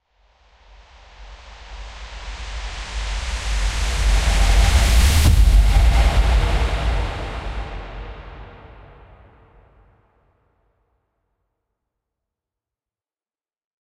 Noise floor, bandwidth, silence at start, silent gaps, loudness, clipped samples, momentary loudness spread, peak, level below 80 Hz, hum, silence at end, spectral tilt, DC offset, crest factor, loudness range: under -90 dBFS; 15 kHz; 1.2 s; none; -20 LUFS; under 0.1%; 23 LU; -4 dBFS; -20 dBFS; none; 5.25 s; -4.5 dB/octave; under 0.1%; 16 dB; 18 LU